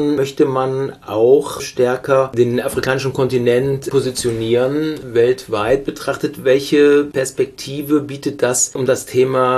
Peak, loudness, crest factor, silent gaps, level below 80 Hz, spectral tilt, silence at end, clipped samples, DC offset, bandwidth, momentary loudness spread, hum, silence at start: -2 dBFS; -17 LUFS; 14 dB; none; -48 dBFS; -5 dB/octave; 0 s; under 0.1%; under 0.1%; 14 kHz; 8 LU; none; 0 s